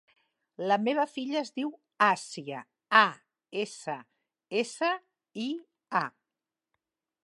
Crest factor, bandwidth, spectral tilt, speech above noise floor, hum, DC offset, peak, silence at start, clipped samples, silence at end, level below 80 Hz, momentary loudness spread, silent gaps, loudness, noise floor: 26 dB; 11.5 kHz; -3.5 dB/octave; 61 dB; none; under 0.1%; -6 dBFS; 0.6 s; under 0.1%; 1.2 s; -88 dBFS; 15 LU; none; -30 LUFS; -90 dBFS